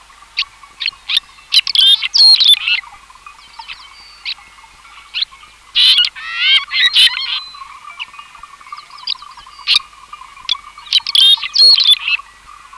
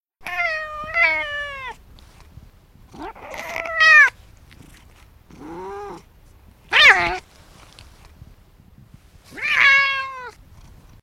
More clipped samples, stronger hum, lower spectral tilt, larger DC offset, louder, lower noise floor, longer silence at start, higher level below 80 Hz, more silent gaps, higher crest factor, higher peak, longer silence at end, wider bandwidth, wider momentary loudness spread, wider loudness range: neither; neither; second, 3.5 dB/octave vs -1.5 dB/octave; neither; first, -10 LUFS vs -15 LUFS; second, -41 dBFS vs -49 dBFS; first, 0.35 s vs 0.2 s; second, -54 dBFS vs -48 dBFS; neither; second, 14 dB vs 20 dB; about the same, 0 dBFS vs -2 dBFS; second, 0.55 s vs 0.75 s; second, 13.5 kHz vs 16 kHz; second, 21 LU vs 25 LU; first, 10 LU vs 6 LU